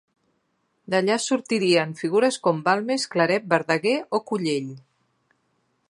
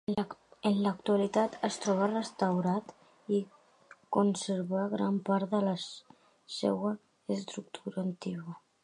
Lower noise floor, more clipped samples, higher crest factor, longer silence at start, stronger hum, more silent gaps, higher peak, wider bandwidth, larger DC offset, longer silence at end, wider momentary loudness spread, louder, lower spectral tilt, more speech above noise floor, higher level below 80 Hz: first, -71 dBFS vs -60 dBFS; neither; about the same, 22 dB vs 20 dB; first, 0.9 s vs 0.1 s; neither; neither; first, -2 dBFS vs -12 dBFS; about the same, 11.5 kHz vs 11 kHz; neither; first, 1.1 s vs 0.25 s; second, 5 LU vs 12 LU; first, -23 LUFS vs -32 LUFS; second, -4.5 dB/octave vs -6 dB/octave; first, 49 dB vs 29 dB; about the same, -74 dBFS vs -76 dBFS